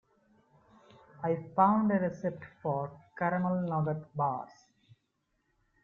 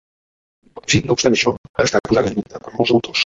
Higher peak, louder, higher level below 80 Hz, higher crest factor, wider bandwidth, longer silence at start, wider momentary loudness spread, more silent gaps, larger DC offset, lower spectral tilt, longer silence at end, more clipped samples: second, -12 dBFS vs -2 dBFS; second, -32 LUFS vs -17 LUFS; second, -72 dBFS vs -44 dBFS; first, 22 dB vs 16 dB; second, 6.8 kHz vs 7.8 kHz; first, 1.2 s vs 0.75 s; about the same, 12 LU vs 10 LU; second, none vs 1.58-1.74 s; neither; first, -10 dB/octave vs -4 dB/octave; first, 1.4 s vs 0.1 s; neither